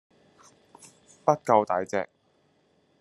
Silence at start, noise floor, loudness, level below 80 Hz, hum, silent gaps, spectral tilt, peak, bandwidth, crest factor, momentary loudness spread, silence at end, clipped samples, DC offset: 1.25 s; -67 dBFS; -26 LUFS; -76 dBFS; none; none; -6 dB/octave; -6 dBFS; 12.5 kHz; 24 dB; 10 LU; 0.95 s; under 0.1%; under 0.1%